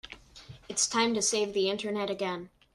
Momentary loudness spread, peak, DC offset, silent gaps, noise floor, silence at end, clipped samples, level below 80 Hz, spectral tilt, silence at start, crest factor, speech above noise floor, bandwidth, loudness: 19 LU; -14 dBFS; under 0.1%; none; -51 dBFS; 0.3 s; under 0.1%; -64 dBFS; -2 dB/octave; 0.05 s; 18 dB; 22 dB; 13 kHz; -29 LUFS